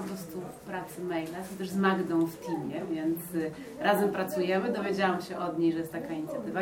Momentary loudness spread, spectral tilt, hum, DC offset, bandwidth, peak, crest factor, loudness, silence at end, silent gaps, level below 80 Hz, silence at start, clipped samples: 11 LU; -6 dB/octave; none; under 0.1%; 17 kHz; -12 dBFS; 20 dB; -31 LUFS; 0 s; none; -66 dBFS; 0 s; under 0.1%